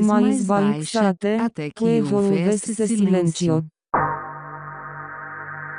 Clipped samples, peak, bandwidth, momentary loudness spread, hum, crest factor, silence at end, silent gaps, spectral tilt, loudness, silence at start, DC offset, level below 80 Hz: under 0.1%; -6 dBFS; 11 kHz; 15 LU; 50 Hz at -45 dBFS; 16 dB; 0 s; none; -6 dB/octave; -21 LUFS; 0 s; under 0.1%; -56 dBFS